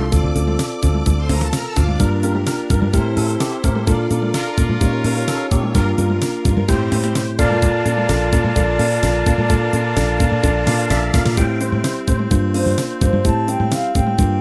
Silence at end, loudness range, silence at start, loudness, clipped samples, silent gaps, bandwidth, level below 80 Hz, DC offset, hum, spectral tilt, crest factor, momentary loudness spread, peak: 0 s; 1 LU; 0 s; -18 LUFS; under 0.1%; none; 11 kHz; -22 dBFS; 0.1%; none; -6 dB/octave; 14 dB; 3 LU; -2 dBFS